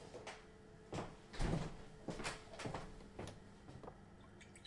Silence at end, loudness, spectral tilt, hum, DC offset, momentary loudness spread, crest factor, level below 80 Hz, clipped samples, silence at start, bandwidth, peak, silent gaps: 0 s; -49 LUFS; -5 dB/octave; none; under 0.1%; 17 LU; 22 dB; -54 dBFS; under 0.1%; 0 s; 11.5 kHz; -26 dBFS; none